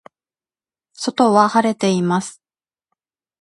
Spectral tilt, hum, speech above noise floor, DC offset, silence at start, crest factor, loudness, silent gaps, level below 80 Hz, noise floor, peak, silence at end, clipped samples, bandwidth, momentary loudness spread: -5.5 dB/octave; none; over 74 dB; under 0.1%; 1 s; 20 dB; -17 LUFS; none; -66 dBFS; under -90 dBFS; 0 dBFS; 1.1 s; under 0.1%; 11.5 kHz; 12 LU